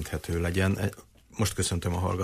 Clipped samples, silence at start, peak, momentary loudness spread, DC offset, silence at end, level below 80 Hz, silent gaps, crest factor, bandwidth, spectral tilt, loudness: under 0.1%; 0 s; -14 dBFS; 6 LU; under 0.1%; 0 s; -44 dBFS; none; 16 dB; 15.5 kHz; -5 dB/octave; -29 LUFS